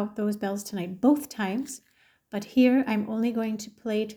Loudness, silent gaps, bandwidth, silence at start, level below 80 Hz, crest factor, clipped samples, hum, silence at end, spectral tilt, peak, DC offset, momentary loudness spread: -27 LUFS; none; over 20 kHz; 0 s; -70 dBFS; 18 dB; under 0.1%; none; 0 s; -5.5 dB/octave; -10 dBFS; under 0.1%; 14 LU